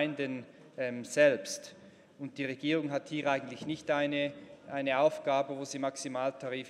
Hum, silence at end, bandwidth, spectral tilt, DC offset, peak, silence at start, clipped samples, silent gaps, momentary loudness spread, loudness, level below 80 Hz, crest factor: none; 0 s; 13.5 kHz; -4.5 dB/octave; under 0.1%; -14 dBFS; 0 s; under 0.1%; none; 15 LU; -33 LUFS; -78 dBFS; 20 dB